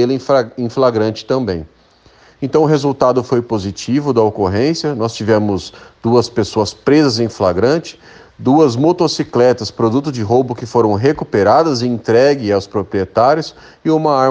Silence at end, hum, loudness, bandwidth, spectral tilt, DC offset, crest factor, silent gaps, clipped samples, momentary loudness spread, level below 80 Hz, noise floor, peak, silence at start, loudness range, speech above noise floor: 0 s; none; -14 LUFS; 9.4 kHz; -6.5 dB/octave; under 0.1%; 14 dB; none; under 0.1%; 8 LU; -50 dBFS; -48 dBFS; 0 dBFS; 0 s; 2 LU; 34 dB